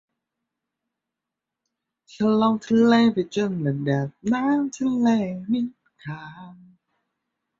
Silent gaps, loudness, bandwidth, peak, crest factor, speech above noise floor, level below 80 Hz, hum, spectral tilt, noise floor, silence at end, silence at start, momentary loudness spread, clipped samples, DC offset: none; -22 LUFS; 7.6 kHz; -6 dBFS; 18 dB; 64 dB; -64 dBFS; none; -7 dB/octave; -86 dBFS; 1.05 s; 2.15 s; 18 LU; under 0.1%; under 0.1%